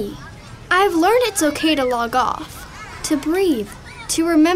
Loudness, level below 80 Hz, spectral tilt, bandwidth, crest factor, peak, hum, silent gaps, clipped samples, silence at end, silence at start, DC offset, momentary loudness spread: -18 LUFS; -44 dBFS; -3.5 dB/octave; 16 kHz; 14 dB; -4 dBFS; none; none; under 0.1%; 0 s; 0 s; under 0.1%; 19 LU